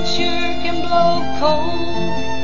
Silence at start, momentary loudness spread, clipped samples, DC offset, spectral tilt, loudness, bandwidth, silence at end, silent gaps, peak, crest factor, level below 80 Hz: 0 s; 7 LU; under 0.1%; 20%; -5 dB/octave; -19 LUFS; 7.4 kHz; 0 s; none; -2 dBFS; 16 dB; -36 dBFS